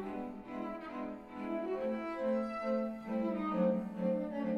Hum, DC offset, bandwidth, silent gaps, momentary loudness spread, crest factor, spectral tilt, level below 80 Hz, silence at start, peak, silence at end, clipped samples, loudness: none; under 0.1%; 7 kHz; none; 10 LU; 16 dB; -8.5 dB/octave; -66 dBFS; 0 s; -22 dBFS; 0 s; under 0.1%; -37 LUFS